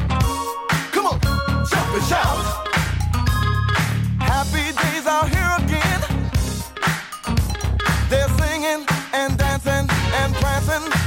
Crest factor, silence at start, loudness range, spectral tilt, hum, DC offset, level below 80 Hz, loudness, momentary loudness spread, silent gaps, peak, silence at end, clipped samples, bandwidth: 14 dB; 0 s; 1 LU; -5 dB/octave; none; under 0.1%; -26 dBFS; -20 LUFS; 4 LU; none; -6 dBFS; 0 s; under 0.1%; 17 kHz